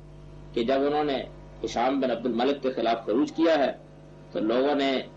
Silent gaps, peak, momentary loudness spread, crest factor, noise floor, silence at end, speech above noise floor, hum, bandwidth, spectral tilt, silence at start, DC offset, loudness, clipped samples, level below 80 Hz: none; -12 dBFS; 12 LU; 14 dB; -47 dBFS; 0 s; 22 dB; 50 Hz at -50 dBFS; 8 kHz; -5.5 dB/octave; 0 s; under 0.1%; -26 LUFS; under 0.1%; -54 dBFS